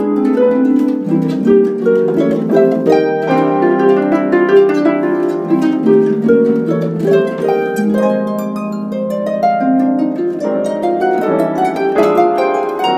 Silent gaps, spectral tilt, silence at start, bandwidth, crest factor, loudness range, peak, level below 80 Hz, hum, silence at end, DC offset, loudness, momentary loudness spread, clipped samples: none; -7.5 dB/octave; 0 s; 15 kHz; 12 dB; 3 LU; 0 dBFS; -60 dBFS; none; 0 s; under 0.1%; -13 LUFS; 6 LU; under 0.1%